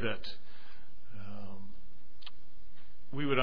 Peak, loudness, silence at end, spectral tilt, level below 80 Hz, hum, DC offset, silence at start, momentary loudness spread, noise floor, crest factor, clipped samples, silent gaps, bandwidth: -12 dBFS; -43 LUFS; 0 s; -7.5 dB/octave; -60 dBFS; none; 4%; 0 s; 25 LU; -57 dBFS; 26 dB; under 0.1%; none; 5.4 kHz